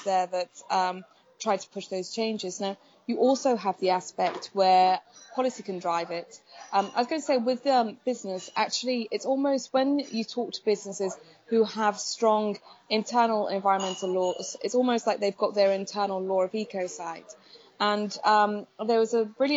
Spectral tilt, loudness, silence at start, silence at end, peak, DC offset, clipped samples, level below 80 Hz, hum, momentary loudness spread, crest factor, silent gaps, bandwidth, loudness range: -4 dB/octave; -27 LUFS; 0 s; 0 s; -10 dBFS; under 0.1%; under 0.1%; -84 dBFS; none; 10 LU; 18 dB; none; 8 kHz; 3 LU